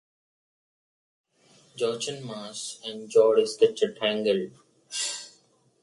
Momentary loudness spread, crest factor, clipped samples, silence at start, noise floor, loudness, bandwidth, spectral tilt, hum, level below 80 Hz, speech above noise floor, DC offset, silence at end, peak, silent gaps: 16 LU; 20 dB; under 0.1%; 1.75 s; -63 dBFS; -26 LUFS; 11.5 kHz; -3 dB/octave; none; -78 dBFS; 38 dB; under 0.1%; 0.55 s; -8 dBFS; none